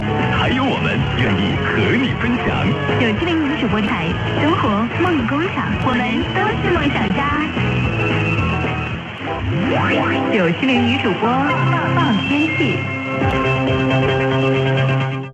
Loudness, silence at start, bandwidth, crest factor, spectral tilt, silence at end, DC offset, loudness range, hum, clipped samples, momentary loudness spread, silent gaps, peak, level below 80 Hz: -17 LUFS; 0 s; 8.4 kHz; 14 dB; -7 dB/octave; 0 s; under 0.1%; 2 LU; none; under 0.1%; 3 LU; none; -4 dBFS; -34 dBFS